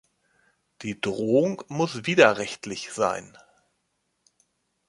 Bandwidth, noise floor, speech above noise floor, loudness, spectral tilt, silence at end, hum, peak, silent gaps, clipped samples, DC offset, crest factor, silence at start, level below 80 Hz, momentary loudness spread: 11.5 kHz; -75 dBFS; 51 dB; -24 LUFS; -4.5 dB/octave; 1.6 s; none; -2 dBFS; none; under 0.1%; under 0.1%; 24 dB; 0.8 s; -66 dBFS; 16 LU